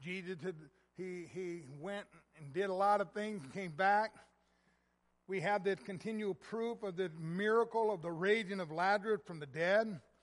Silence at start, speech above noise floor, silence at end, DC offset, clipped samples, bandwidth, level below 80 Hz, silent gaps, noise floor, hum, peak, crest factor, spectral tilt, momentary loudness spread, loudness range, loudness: 0 s; 41 dB; 0.25 s; under 0.1%; under 0.1%; 11.5 kHz; -80 dBFS; none; -78 dBFS; none; -20 dBFS; 18 dB; -6 dB/octave; 13 LU; 5 LU; -37 LUFS